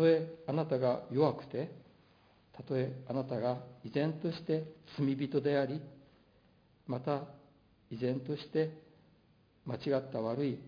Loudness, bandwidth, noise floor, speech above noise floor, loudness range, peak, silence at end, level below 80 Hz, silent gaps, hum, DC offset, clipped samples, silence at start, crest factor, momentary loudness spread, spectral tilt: -36 LUFS; 5.2 kHz; -67 dBFS; 33 dB; 4 LU; -16 dBFS; 0 s; -74 dBFS; none; none; under 0.1%; under 0.1%; 0 s; 20 dB; 13 LU; -6.5 dB/octave